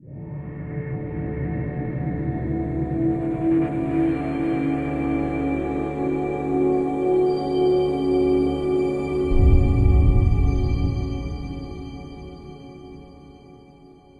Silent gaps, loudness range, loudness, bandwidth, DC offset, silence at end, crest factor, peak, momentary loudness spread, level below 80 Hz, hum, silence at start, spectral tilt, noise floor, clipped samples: none; 7 LU; -23 LUFS; 9 kHz; under 0.1%; 0.65 s; 18 dB; -4 dBFS; 17 LU; -28 dBFS; none; 0.05 s; -9.5 dB/octave; -48 dBFS; under 0.1%